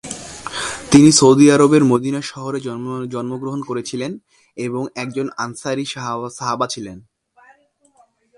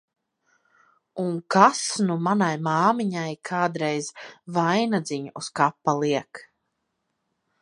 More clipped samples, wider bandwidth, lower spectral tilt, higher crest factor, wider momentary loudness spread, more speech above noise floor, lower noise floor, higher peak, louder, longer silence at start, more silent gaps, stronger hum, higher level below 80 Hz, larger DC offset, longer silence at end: neither; about the same, 11.5 kHz vs 11 kHz; about the same, -5 dB/octave vs -5 dB/octave; second, 18 dB vs 24 dB; first, 18 LU vs 14 LU; second, 40 dB vs 54 dB; second, -56 dBFS vs -77 dBFS; about the same, 0 dBFS vs 0 dBFS; first, -17 LUFS vs -24 LUFS; second, 0.05 s vs 1.15 s; neither; neither; first, -54 dBFS vs -76 dBFS; neither; first, 1.4 s vs 1.2 s